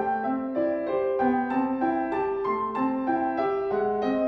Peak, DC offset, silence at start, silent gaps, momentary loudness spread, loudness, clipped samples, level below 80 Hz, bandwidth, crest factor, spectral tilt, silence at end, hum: -12 dBFS; under 0.1%; 0 s; none; 3 LU; -26 LUFS; under 0.1%; -58 dBFS; 5.8 kHz; 14 dB; -8.5 dB/octave; 0 s; none